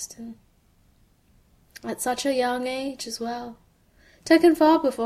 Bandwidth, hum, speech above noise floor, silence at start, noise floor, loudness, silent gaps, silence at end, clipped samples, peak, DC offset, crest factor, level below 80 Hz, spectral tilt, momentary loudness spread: 15 kHz; none; 38 dB; 0 s; -61 dBFS; -23 LUFS; none; 0 s; under 0.1%; -4 dBFS; under 0.1%; 20 dB; -60 dBFS; -3 dB/octave; 23 LU